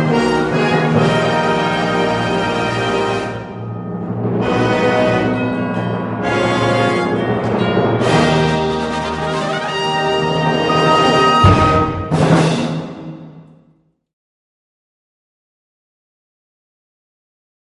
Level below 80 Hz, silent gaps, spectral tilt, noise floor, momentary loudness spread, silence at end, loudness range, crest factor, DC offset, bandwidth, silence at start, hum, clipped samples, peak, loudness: -36 dBFS; none; -6 dB/octave; -56 dBFS; 10 LU; 4.25 s; 5 LU; 16 dB; under 0.1%; 11.5 kHz; 0 s; none; under 0.1%; 0 dBFS; -15 LUFS